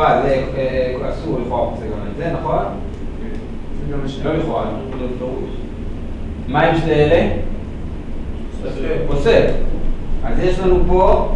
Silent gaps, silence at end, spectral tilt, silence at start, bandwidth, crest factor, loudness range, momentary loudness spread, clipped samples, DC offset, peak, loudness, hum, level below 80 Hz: none; 0 s; -7.5 dB/octave; 0 s; 7.8 kHz; 16 dB; 6 LU; 15 LU; under 0.1%; under 0.1%; 0 dBFS; -20 LUFS; none; -22 dBFS